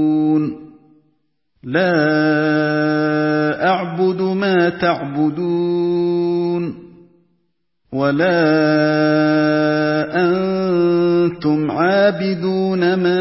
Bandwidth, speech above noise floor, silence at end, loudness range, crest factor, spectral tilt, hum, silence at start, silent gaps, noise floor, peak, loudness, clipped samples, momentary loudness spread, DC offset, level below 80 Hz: 5.8 kHz; 54 dB; 0 s; 3 LU; 14 dB; -10.5 dB/octave; none; 0 s; none; -69 dBFS; -2 dBFS; -16 LUFS; under 0.1%; 5 LU; under 0.1%; -58 dBFS